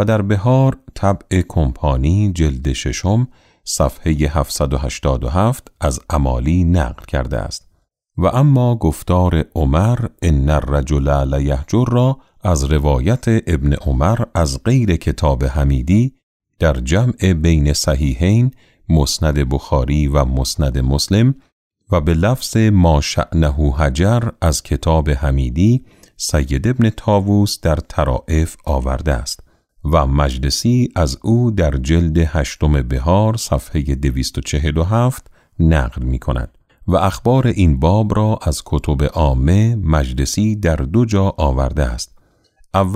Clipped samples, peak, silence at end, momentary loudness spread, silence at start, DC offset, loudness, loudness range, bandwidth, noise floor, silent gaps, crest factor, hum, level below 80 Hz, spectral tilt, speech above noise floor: under 0.1%; -2 dBFS; 0 s; 6 LU; 0 s; under 0.1%; -16 LUFS; 3 LU; 15.5 kHz; -58 dBFS; 16.23-16.40 s, 21.52-21.71 s; 14 dB; none; -22 dBFS; -6.5 dB/octave; 43 dB